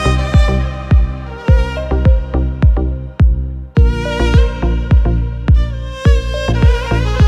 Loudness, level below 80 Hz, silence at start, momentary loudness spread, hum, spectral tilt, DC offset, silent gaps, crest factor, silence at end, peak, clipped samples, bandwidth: -15 LUFS; -14 dBFS; 0 s; 5 LU; none; -7.5 dB/octave; under 0.1%; none; 12 dB; 0 s; 0 dBFS; under 0.1%; 8.6 kHz